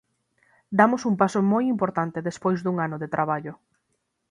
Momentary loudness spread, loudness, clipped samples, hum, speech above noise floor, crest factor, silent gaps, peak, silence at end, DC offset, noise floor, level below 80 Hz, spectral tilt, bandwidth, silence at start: 8 LU; -24 LUFS; under 0.1%; none; 52 dB; 22 dB; none; -2 dBFS; 0.75 s; under 0.1%; -75 dBFS; -66 dBFS; -7 dB/octave; 10.5 kHz; 0.7 s